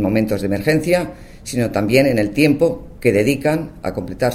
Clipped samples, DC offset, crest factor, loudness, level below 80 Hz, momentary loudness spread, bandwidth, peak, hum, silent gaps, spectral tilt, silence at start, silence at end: under 0.1%; under 0.1%; 16 dB; -18 LUFS; -40 dBFS; 11 LU; 16 kHz; 0 dBFS; none; none; -6 dB/octave; 0 s; 0 s